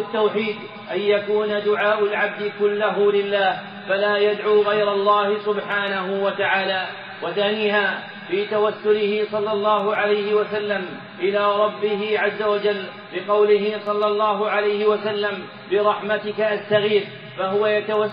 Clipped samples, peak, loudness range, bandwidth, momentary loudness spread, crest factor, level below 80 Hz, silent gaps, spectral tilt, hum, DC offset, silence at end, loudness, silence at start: under 0.1%; -4 dBFS; 2 LU; 5.2 kHz; 7 LU; 16 dB; -76 dBFS; none; -2 dB/octave; none; under 0.1%; 0 s; -21 LUFS; 0 s